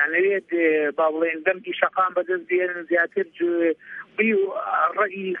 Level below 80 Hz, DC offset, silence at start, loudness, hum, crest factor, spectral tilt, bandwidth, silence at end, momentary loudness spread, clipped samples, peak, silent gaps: -78 dBFS; under 0.1%; 0 s; -22 LUFS; none; 20 dB; -8 dB/octave; 3.7 kHz; 0 s; 4 LU; under 0.1%; -4 dBFS; none